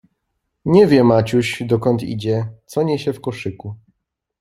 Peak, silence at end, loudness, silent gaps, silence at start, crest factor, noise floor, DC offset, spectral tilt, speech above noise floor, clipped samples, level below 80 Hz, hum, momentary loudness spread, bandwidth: -2 dBFS; 0.65 s; -17 LUFS; none; 0.65 s; 16 dB; -74 dBFS; under 0.1%; -7 dB/octave; 57 dB; under 0.1%; -52 dBFS; none; 16 LU; 15 kHz